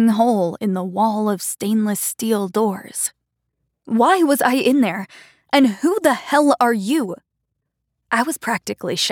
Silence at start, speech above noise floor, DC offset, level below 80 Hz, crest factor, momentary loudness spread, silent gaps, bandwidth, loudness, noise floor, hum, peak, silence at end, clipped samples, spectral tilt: 0 s; 58 dB; under 0.1%; -70 dBFS; 16 dB; 8 LU; none; 19 kHz; -19 LUFS; -76 dBFS; none; -4 dBFS; 0 s; under 0.1%; -4 dB/octave